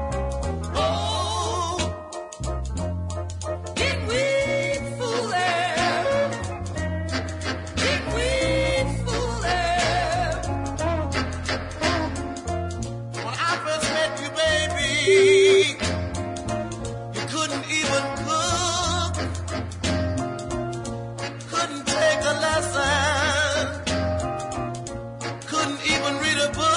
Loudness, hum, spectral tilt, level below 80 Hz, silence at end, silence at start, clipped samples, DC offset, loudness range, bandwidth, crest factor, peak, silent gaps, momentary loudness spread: -24 LUFS; none; -4 dB/octave; -38 dBFS; 0 s; 0 s; under 0.1%; under 0.1%; 6 LU; 11 kHz; 18 dB; -6 dBFS; none; 10 LU